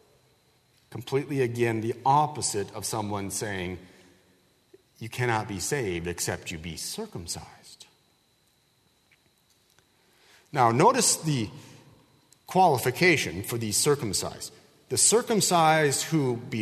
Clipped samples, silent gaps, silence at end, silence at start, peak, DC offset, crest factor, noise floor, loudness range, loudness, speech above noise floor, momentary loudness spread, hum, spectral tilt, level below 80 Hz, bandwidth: under 0.1%; none; 0 s; 0.9 s; -6 dBFS; under 0.1%; 22 dB; -67 dBFS; 12 LU; -25 LUFS; 41 dB; 16 LU; none; -3.5 dB/octave; -60 dBFS; 13.5 kHz